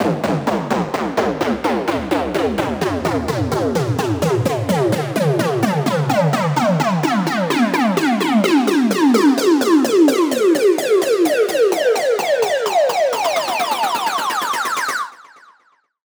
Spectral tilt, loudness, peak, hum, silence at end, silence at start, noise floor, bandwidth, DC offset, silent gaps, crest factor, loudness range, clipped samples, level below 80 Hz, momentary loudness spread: -5.5 dB/octave; -17 LUFS; -2 dBFS; none; 0.9 s; 0 s; -58 dBFS; over 20 kHz; under 0.1%; none; 14 dB; 5 LU; under 0.1%; -48 dBFS; 6 LU